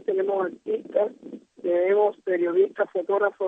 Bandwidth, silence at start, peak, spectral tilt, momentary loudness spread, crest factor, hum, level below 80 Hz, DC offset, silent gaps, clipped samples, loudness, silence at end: 3.8 kHz; 0.1 s; -10 dBFS; -7.5 dB/octave; 9 LU; 14 dB; none; -82 dBFS; under 0.1%; none; under 0.1%; -25 LUFS; 0 s